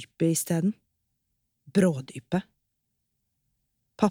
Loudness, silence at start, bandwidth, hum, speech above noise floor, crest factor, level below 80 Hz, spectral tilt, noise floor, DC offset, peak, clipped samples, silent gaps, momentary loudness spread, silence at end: -27 LUFS; 0 s; 16.5 kHz; none; 53 dB; 22 dB; -70 dBFS; -6 dB/octave; -79 dBFS; under 0.1%; -8 dBFS; under 0.1%; none; 8 LU; 0 s